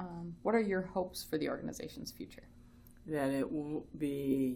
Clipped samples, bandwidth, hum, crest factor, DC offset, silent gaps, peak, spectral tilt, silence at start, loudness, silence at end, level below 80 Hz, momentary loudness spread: under 0.1%; 19.5 kHz; none; 18 dB; under 0.1%; none; -18 dBFS; -6 dB/octave; 0 s; -37 LUFS; 0 s; -60 dBFS; 14 LU